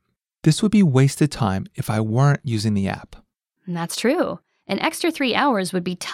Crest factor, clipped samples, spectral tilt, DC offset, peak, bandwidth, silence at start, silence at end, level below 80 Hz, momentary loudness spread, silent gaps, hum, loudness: 18 dB; under 0.1%; -6 dB/octave; under 0.1%; -4 dBFS; 15 kHz; 0.45 s; 0 s; -52 dBFS; 11 LU; none; none; -21 LUFS